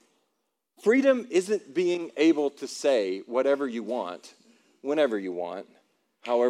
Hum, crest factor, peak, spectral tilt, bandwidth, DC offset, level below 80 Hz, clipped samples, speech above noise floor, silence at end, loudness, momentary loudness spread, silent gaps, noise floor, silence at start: none; 18 dB; -10 dBFS; -4.5 dB/octave; 12.5 kHz; under 0.1%; under -90 dBFS; under 0.1%; 53 dB; 0 s; -26 LUFS; 14 LU; none; -79 dBFS; 0.85 s